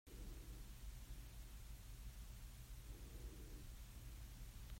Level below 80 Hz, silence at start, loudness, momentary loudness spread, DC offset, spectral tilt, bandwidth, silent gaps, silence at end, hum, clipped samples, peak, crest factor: -56 dBFS; 0.05 s; -58 LUFS; 2 LU; under 0.1%; -4.5 dB/octave; 16 kHz; none; 0 s; none; under 0.1%; -44 dBFS; 12 dB